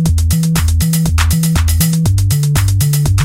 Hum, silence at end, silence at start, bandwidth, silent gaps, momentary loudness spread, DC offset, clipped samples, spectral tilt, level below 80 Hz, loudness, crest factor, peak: none; 0 s; 0 s; 17 kHz; none; 1 LU; under 0.1%; under 0.1%; -5 dB/octave; -20 dBFS; -13 LUFS; 12 dB; 0 dBFS